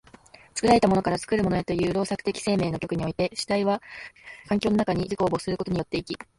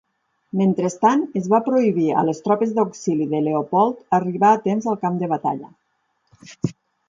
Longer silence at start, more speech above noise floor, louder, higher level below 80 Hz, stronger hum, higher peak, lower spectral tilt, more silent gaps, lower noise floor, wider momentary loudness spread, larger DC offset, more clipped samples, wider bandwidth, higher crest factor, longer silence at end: about the same, 0.55 s vs 0.55 s; second, 27 dB vs 50 dB; second, -25 LUFS vs -20 LUFS; first, -50 dBFS vs -66 dBFS; neither; about the same, -6 dBFS vs -4 dBFS; second, -5.5 dB/octave vs -7.5 dB/octave; neither; second, -52 dBFS vs -69 dBFS; about the same, 10 LU vs 10 LU; neither; neither; first, 11.5 kHz vs 7.6 kHz; about the same, 20 dB vs 16 dB; second, 0.15 s vs 0.35 s